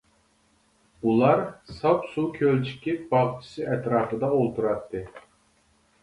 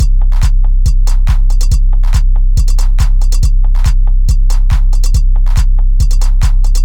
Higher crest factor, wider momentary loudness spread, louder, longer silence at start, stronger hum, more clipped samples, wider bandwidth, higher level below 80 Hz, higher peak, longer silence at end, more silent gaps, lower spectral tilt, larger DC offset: first, 20 dB vs 6 dB; first, 11 LU vs 0 LU; second, -25 LUFS vs -14 LUFS; first, 1.05 s vs 0 s; neither; neither; first, 11.5 kHz vs 10 kHz; second, -58 dBFS vs -6 dBFS; second, -6 dBFS vs 0 dBFS; first, 0.8 s vs 0 s; neither; first, -8.5 dB/octave vs -5 dB/octave; neither